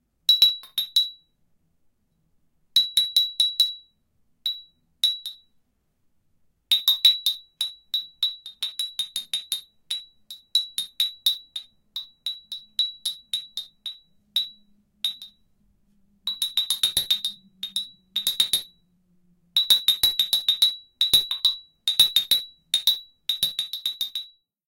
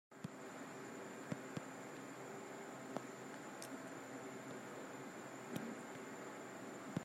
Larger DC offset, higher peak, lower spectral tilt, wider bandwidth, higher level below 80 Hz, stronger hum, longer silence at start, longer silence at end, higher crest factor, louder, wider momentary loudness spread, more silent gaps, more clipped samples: neither; first, -4 dBFS vs -26 dBFS; second, 2 dB/octave vs -4.5 dB/octave; about the same, 17 kHz vs 16 kHz; first, -66 dBFS vs -88 dBFS; neither; first, 0.3 s vs 0.1 s; first, 0.4 s vs 0 s; about the same, 22 dB vs 24 dB; first, -22 LUFS vs -51 LUFS; first, 16 LU vs 4 LU; neither; neither